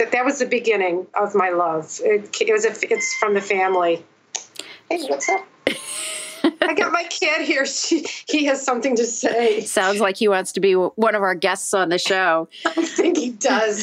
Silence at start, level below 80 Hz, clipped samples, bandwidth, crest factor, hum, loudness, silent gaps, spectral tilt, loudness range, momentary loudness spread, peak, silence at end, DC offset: 0 s; -74 dBFS; under 0.1%; 16 kHz; 20 dB; none; -20 LUFS; none; -2.5 dB/octave; 3 LU; 7 LU; 0 dBFS; 0 s; under 0.1%